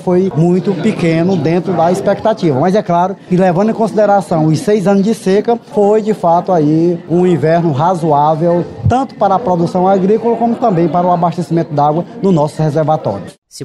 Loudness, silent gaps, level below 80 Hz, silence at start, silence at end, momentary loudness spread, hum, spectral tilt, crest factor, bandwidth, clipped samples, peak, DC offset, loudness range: -12 LUFS; 13.38-13.42 s; -48 dBFS; 0 s; 0 s; 3 LU; none; -8 dB/octave; 10 dB; 12 kHz; under 0.1%; -2 dBFS; 0.1%; 1 LU